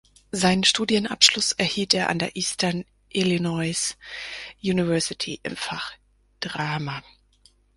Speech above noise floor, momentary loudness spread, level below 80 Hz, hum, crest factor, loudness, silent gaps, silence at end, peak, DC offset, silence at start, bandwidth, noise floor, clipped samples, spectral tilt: 35 dB; 16 LU; -56 dBFS; none; 24 dB; -23 LUFS; none; 0.75 s; 0 dBFS; under 0.1%; 0.35 s; 11.5 kHz; -60 dBFS; under 0.1%; -3 dB/octave